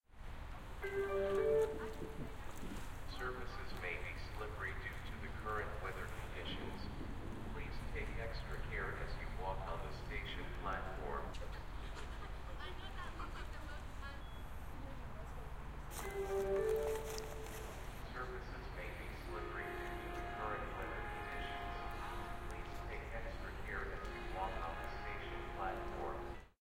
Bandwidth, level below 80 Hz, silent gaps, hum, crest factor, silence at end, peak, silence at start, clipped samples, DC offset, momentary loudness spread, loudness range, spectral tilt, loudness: 16 kHz; -48 dBFS; none; none; 18 dB; 0.1 s; -26 dBFS; 0.1 s; under 0.1%; under 0.1%; 10 LU; 7 LU; -5.5 dB/octave; -45 LUFS